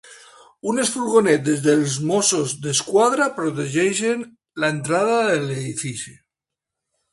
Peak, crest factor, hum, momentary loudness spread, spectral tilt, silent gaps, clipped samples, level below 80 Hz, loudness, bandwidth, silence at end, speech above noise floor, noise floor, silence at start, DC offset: -4 dBFS; 18 dB; none; 11 LU; -4 dB/octave; none; under 0.1%; -62 dBFS; -20 LUFS; 11.5 kHz; 1 s; 66 dB; -86 dBFS; 0.1 s; under 0.1%